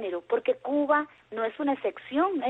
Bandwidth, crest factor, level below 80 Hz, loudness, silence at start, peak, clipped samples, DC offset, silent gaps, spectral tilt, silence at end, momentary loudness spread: 4.1 kHz; 16 dB; -72 dBFS; -28 LUFS; 0 s; -12 dBFS; under 0.1%; under 0.1%; none; -6.5 dB/octave; 0 s; 8 LU